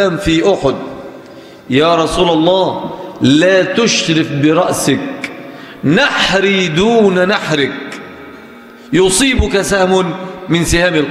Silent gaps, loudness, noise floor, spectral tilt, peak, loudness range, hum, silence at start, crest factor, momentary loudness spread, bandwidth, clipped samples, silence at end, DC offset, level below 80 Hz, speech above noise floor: none; -12 LUFS; -35 dBFS; -4.5 dB/octave; 0 dBFS; 2 LU; none; 0 s; 12 dB; 15 LU; 15.5 kHz; under 0.1%; 0 s; under 0.1%; -32 dBFS; 24 dB